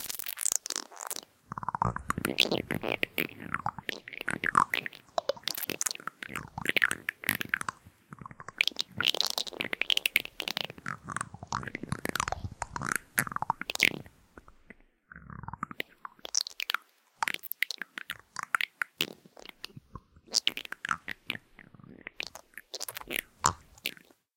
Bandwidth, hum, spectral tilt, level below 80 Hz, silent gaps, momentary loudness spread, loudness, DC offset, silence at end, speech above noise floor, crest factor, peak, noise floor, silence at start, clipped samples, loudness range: 17 kHz; none; -1.5 dB/octave; -58 dBFS; none; 17 LU; -32 LUFS; under 0.1%; 0.45 s; 25 dB; 30 dB; -6 dBFS; -57 dBFS; 0 s; under 0.1%; 6 LU